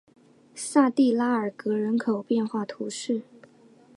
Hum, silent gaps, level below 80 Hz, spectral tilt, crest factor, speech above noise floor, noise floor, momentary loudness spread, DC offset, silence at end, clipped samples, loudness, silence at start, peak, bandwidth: none; none; -80 dBFS; -5 dB/octave; 18 dB; 30 dB; -55 dBFS; 11 LU; under 0.1%; 0.75 s; under 0.1%; -26 LUFS; 0.55 s; -8 dBFS; 11.5 kHz